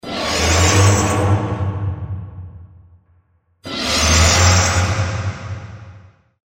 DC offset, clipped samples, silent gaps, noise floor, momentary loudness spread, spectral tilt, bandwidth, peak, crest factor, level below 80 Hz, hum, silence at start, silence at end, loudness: under 0.1%; under 0.1%; none; -58 dBFS; 19 LU; -3.5 dB/octave; 16.5 kHz; 0 dBFS; 18 dB; -30 dBFS; none; 0.05 s; 0.5 s; -15 LUFS